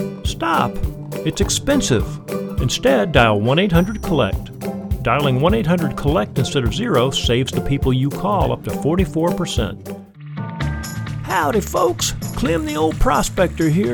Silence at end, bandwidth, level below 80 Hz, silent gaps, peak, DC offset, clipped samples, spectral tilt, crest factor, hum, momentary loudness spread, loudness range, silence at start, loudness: 0 s; 19 kHz; -30 dBFS; none; 0 dBFS; under 0.1%; under 0.1%; -5 dB/octave; 18 dB; none; 10 LU; 4 LU; 0 s; -19 LUFS